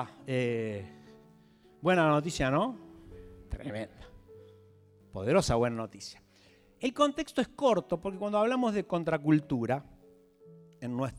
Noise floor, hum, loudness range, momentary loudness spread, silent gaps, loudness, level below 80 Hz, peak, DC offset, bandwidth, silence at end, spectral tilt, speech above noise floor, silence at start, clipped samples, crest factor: -61 dBFS; none; 5 LU; 19 LU; none; -30 LUFS; -54 dBFS; -12 dBFS; under 0.1%; 14.5 kHz; 0 s; -6 dB/octave; 32 dB; 0 s; under 0.1%; 20 dB